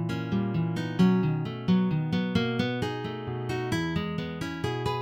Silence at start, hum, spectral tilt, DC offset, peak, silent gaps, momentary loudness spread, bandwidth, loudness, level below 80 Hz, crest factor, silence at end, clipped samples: 0 s; none; -7 dB/octave; under 0.1%; -10 dBFS; none; 9 LU; 11.5 kHz; -28 LUFS; -54 dBFS; 18 dB; 0 s; under 0.1%